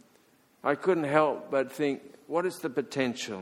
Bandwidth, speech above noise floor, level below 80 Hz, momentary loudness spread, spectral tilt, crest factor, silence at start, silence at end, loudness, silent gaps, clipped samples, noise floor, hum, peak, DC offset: 16.5 kHz; 35 dB; -76 dBFS; 8 LU; -5 dB/octave; 22 dB; 0.65 s; 0 s; -29 LUFS; none; under 0.1%; -63 dBFS; none; -8 dBFS; under 0.1%